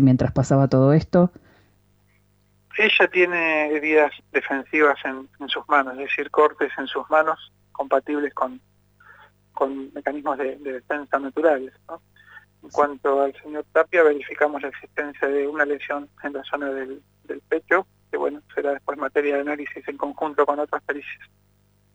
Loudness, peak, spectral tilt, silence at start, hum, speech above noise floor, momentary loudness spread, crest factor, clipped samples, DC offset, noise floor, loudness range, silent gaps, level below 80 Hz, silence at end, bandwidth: -22 LUFS; -6 dBFS; -7 dB/octave; 0 s; 50 Hz at -60 dBFS; 39 dB; 14 LU; 18 dB; under 0.1%; under 0.1%; -61 dBFS; 7 LU; none; -56 dBFS; 0.7 s; 8.2 kHz